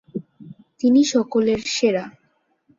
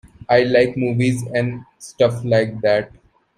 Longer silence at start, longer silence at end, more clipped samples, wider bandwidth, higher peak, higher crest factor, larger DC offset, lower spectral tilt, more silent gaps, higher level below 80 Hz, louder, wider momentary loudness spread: second, 0.15 s vs 0.3 s; first, 0.7 s vs 0.5 s; neither; second, 7.6 kHz vs 12.5 kHz; second, -6 dBFS vs -2 dBFS; about the same, 16 dB vs 18 dB; neither; second, -4 dB/octave vs -6.5 dB/octave; neither; second, -60 dBFS vs -52 dBFS; about the same, -19 LUFS vs -18 LUFS; first, 18 LU vs 12 LU